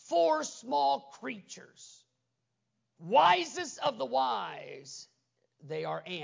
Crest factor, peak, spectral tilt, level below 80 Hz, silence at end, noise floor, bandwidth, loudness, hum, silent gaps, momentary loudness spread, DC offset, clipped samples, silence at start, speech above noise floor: 20 dB; -12 dBFS; -3 dB/octave; -88 dBFS; 0 s; -83 dBFS; 7.6 kHz; -30 LUFS; none; none; 22 LU; under 0.1%; under 0.1%; 0.05 s; 52 dB